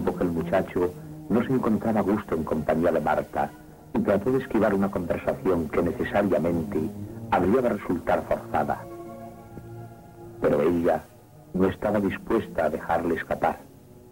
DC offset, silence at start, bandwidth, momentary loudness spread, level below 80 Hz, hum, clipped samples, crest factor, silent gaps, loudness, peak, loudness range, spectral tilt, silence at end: under 0.1%; 0 s; 16.5 kHz; 17 LU; -50 dBFS; none; under 0.1%; 16 dB; none; -26 LUFS; -10 dBFS; 3 LU; -8 dB/octave; 0 s